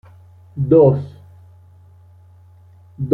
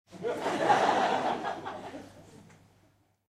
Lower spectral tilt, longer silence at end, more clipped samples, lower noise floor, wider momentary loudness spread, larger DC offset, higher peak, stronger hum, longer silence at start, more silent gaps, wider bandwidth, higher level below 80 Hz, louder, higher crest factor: first, -12.5 dB/octave vs -4 dB/octave; second, 0 s vs 0.85 s; neither; second, -46 dBFS vs -67 dBFS; first, 23 LU vs 20 LU; neither; first, -2 dBFS vs -12 dBFS; neither; first, 0.55 s vs 0.1 s; neither; second, 4.2 kHz vs 14.5 kHz; first, -52 dBFS vs -70 dBFS; first, -15 LUFS vs -29 LUFS; about the same, 18 dB vs 20 dB